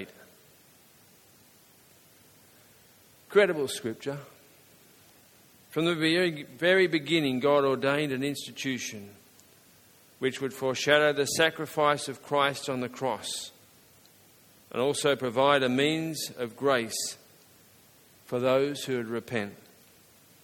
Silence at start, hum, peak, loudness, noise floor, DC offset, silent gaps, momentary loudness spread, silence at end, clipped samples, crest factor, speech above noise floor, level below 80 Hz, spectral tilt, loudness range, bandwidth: 0 s; none; -6 dBFS; -27 LUFS; -58 dBFS; under 0.1%; none; 12 LU; 0.9 s; under 0.1%; 24 dB; 31 dB; -72 dBFS; -4 dB/octave; 6 LU; 17.5 kHz